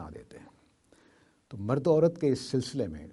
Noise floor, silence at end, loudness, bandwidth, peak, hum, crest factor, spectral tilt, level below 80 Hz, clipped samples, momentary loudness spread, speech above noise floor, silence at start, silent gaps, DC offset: -64 dBFS; 0 s; -28 LUFS; 11.5 kHz; -12 dBFS; none; 20 dB; -7 dB/octave; -60 dBFS; under 0.1%; 22 LU; 36 dB; 0 s; none; under 0.1%